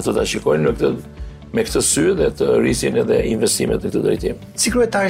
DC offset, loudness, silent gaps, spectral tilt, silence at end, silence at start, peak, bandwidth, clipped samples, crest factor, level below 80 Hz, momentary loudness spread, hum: under 0.1%; -18 LUFS; none; -4 dB/octave; 0 s; 0 s; -6 dBFS; 16 kHz; under 0.1%; 12 dB; -36 dBFS; 8 LU; none